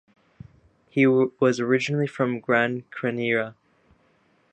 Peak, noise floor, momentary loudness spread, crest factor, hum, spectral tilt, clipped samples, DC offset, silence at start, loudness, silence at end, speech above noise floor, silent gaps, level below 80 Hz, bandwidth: -6 dBFS; -63 dBFS; 9 LU; 20 dB; none; -6.5 dB/octave; under 0.1%; under 0.1%; 0.95 s; -23 LUFS; 1 s; 41 dB; none; -66 dBFS; 8.8 kHz